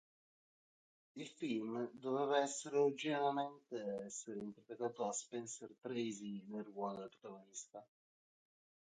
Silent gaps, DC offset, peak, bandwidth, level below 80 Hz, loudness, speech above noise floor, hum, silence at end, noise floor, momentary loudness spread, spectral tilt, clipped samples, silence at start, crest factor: none; under 0.1%; -22 dBFS; 9.4 kHz; under -90 dBFS; -42 LUFS; over 48 dB; none; 1 s; under -90 dBFS; 15 LU; -4 dB/octave; under 0.1%; 1.15 s; 20 dB